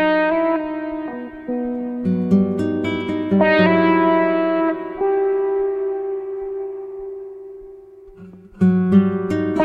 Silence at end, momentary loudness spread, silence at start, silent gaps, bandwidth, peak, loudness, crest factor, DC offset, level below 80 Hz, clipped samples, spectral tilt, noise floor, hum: 0 s; 16 LU; 0 s; none; 5.6 kHz; -2 dBFS; -19 LUFS; 16 dB; under 0.1%; -52 dBFS; under 0.1%; -9 dB/octave; -41 dBFS; none